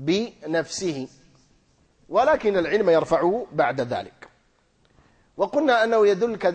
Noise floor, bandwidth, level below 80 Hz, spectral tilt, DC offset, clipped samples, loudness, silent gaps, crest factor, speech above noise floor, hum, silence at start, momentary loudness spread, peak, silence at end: -63 dBFS; 9.4 kHz; -58 dBFS; -5 dB/octave; under 0.1%; under 0.1%; -22 LUFS; none; 16 dB; 42 dB; none; 0 s; 10 LU; -8 dBFS; 0 s